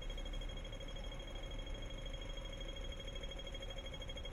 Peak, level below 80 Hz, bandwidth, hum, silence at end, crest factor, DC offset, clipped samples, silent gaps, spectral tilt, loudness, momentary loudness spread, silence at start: -34 dBFS; -46 dBFS; 11.5 kHz; none; 0 s; 12 dB; under 0.1%; under 0.1%; none; -4 dB/octave; -48 LUFS; 1 LU; 0 s